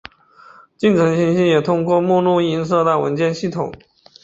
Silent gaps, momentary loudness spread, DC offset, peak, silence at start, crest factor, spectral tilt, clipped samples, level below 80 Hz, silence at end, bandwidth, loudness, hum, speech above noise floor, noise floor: none; 7 LU; under 0.1%; -2 dBFS; 0.8 s; 14 dB; -7 dB/octave; under 0.1%; -56 dBFS; 0.5 s; 8 kHz; -17 LUFS; none; 31 dB; -47 dBFS